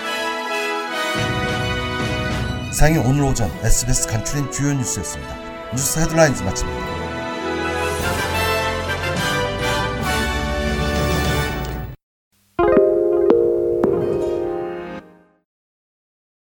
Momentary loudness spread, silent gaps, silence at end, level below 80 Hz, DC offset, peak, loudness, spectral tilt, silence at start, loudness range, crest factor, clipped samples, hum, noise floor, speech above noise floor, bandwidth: 10 LU; 12.03-12.31 s; 1.4 s; -30 dBFS; under 0.1%; 0 dBFS; -20 LUFS; -4.5 dB/octave; 0 s; 2 LU; 20 dB; under 0.1%; none; -41 dBFS; 23 dB; 19 kHz